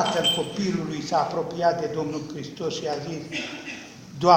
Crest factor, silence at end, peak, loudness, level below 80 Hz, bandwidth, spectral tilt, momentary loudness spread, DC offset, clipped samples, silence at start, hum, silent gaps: 22 dB; 0 s; -4 dBFS; -27 LUFS; -60 dBFS; 16.5 kHz; -4.5 dB/octave; 13 LU; under 0.1%; under 0.1%; 0 s; none; none